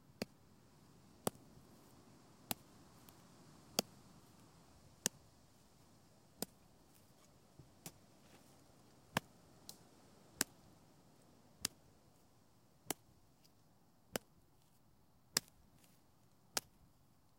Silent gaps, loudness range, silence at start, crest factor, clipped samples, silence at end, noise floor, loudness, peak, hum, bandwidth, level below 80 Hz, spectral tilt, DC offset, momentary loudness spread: none; 6 LU; 0.05 s; 40 dB; under 0.1%; 0.55 s; -72 dBFS; -45 LUFS; -12 dBFS; none; 16.5 kHz; -78 dBFS; -2 dB/octave; under 0.1%; 26 LU